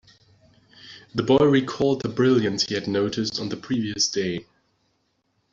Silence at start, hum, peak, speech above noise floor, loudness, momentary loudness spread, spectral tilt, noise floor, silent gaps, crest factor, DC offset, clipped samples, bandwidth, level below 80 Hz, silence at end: 0.85 s; none; -4 dBFS; 48 dB; -23 LUFS; 12 LU; -4.5 dB/octave; -71 dBFS; none; 20 dB; under 0.1%; under 0.1%; 7.8 kHz; -58 dBFS; 1.1 s